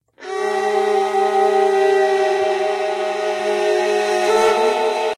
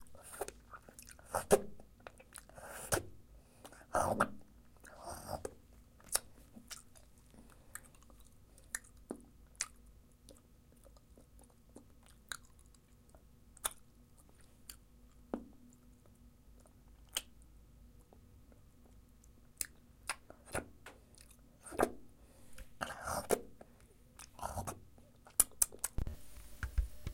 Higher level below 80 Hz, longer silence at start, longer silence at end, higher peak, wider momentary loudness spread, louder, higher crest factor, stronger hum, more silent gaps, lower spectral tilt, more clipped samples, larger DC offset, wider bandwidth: second, -64 dBFS vs -54 dBFS; first, 0.2 s vs 0 s; about the same, 0.05 s vs 0 s; first, -4 dBFS vs -8 dBFS; second, 6 LU vs 28 LU; first, -17 LUFS vs -40 LUFS; second, 14 dB vs 38 dB; neither; neither; about the same, -2.5 dB/octave vs -3 dB/octave; neither; neither; second, 13.5 kHz vs 16.5 kHz